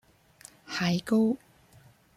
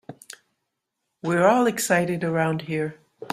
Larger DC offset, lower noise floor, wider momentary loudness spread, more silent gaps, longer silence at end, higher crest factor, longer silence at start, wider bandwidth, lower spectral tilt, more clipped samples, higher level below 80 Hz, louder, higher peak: neither; second, -58 dBFS vs -80 dBFS; second, 11 LU vs 21 LU; neither; first, 0.8 s vs 0 s; about the same, 16 dB vs 20 dB; first, 0.7 s vs 0.1 s; second, 14.5 kHz vs 16 kHz; about the same, -6 dB/octave vs -5 dB/octave; neither; about the same, -66 dBFS vs -64 dBFS; second, -28 LUFS vs -22 LUFS; second, -16 dBFS vs -4 dBFS